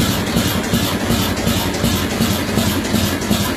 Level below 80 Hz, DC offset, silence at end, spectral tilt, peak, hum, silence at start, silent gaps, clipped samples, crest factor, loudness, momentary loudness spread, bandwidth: -32 dBFS; under 0.1%; 0 s; -4.5 dB/octave; -2 dBFS; none; 0 s; none; under 0.1%; 16 dB; -17 LUFS; 1 LU; 15.5 kHz